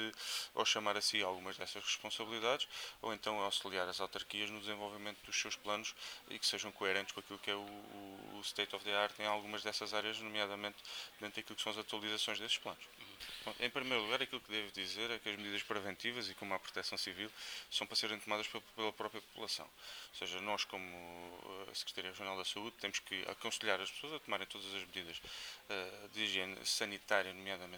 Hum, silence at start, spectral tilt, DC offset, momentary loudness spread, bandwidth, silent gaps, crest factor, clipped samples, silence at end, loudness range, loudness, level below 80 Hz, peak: none; 0 s; -1.5 dB/octave; under 0.1%; 10 LU; over 20 kHz; none; 26 dB; under 0.1%; 0 s; 3 LU; -40 LUFS; -76 dBFS; -16 dBFS